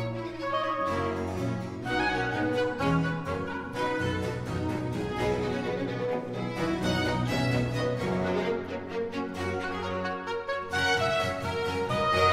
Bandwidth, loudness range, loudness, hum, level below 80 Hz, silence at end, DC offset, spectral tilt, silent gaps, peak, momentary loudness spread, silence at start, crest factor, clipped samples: 15.5 kHz; 2 LU; -30 LUFS; none; -50 dBFS; 0 s; 0.1%; -6 dB/octave; none; -10 dBFS; 6 LU; 0 s; 18 dB; under 0.1%